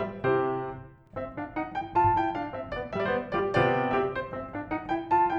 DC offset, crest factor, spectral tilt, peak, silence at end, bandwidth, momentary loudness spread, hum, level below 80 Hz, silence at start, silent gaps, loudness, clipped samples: under 0.1%; 16 dB; -8 dB/octave; -12 dBFS; 0 s; 8 kHz; 12 LU; none; -52 dBFS; 0 s; none; -29 LUFS; under 0.1%